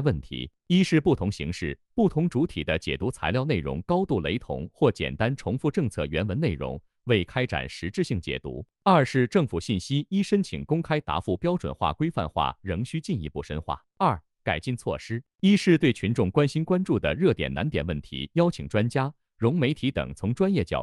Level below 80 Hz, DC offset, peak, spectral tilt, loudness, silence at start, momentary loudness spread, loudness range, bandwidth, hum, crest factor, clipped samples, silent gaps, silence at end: -46 dBFS; under 0.1%; -8 dBFS; -7 dB/octave; -26 LUFS; 0 s; 10 LU; 4 LU; 12 kHz; none; 18 dB; under 0.1%; none; 0 s